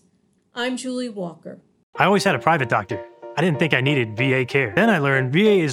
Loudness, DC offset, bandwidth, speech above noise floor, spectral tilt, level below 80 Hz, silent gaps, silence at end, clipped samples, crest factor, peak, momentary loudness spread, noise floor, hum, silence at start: -20 LUFS; under 0.1%; 16 kHz; 43 dB; -6 dB/octave; -62 dBFS; 1.83-1.93 s; 0 s; under 0.1%; 20 dB; 0 dBFS; 15 LU; -63 dBFS; none; 0.55 s